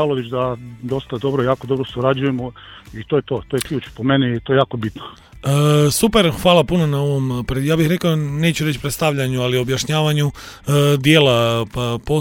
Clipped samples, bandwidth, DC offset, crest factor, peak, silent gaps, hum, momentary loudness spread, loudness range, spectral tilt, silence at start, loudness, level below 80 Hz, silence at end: under 0.1%; 17 kHz; under 0.1%; 18 dB; 0 dBFS; none; none; 12 LU; 5 LU; -5.5 dB/octave; 0 s; -18 LUFS; -40 dBFS; 0 s